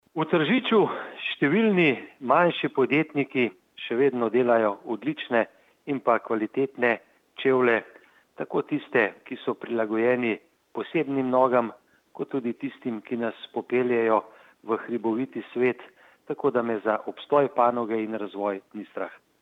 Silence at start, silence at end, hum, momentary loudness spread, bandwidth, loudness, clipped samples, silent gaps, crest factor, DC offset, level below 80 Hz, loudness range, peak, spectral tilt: 0.15 s; 0.25 s; none; 13 LU; 5.2 kHz; -25 LUFS; under 0.1%; none; 18 dB; under 0.1%; -80 dBFS; 4 LU; -6 dBFS; -8 dB/octave